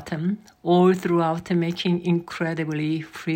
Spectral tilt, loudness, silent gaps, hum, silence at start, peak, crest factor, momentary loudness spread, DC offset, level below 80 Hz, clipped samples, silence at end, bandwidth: -7.5 dB/octave; -23 LUFS; none; none; 0 s; -8 dBFS; 16 dB; 9 LU; under 0.1%; -62 dBFS; under 0.1%; 0 s; 16 kHz